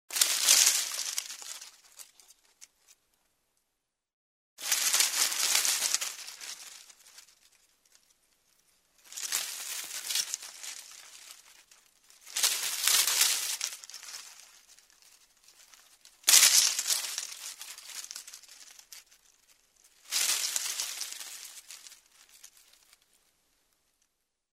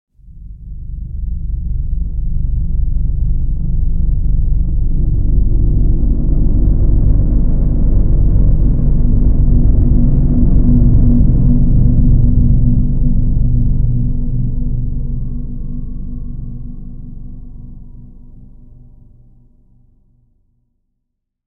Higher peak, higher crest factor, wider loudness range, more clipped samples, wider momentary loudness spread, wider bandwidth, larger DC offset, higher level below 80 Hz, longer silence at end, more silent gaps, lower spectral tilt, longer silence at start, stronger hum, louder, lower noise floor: about the same, -2 dBFS vs 0 dBFS; first, 32 dB vs 12 dB; about the same, 14 LU vs 15 LU; neither; first, 26 LU vs 16 LU; first, 16 kHz vs 1.2 kHz; neither; second, -84 dBFS vs -14 dBFS; second, 2.6 s vs 3 s; first, 4.13-4.57 s vs none; second, 4.5 dB/octave vs -15.5 dB/octave; second, 0.1 s vs 0.35 s; neither; second, -26 LUFS vs -16 LUFS; first, -84 dBFS vs -72 dBFS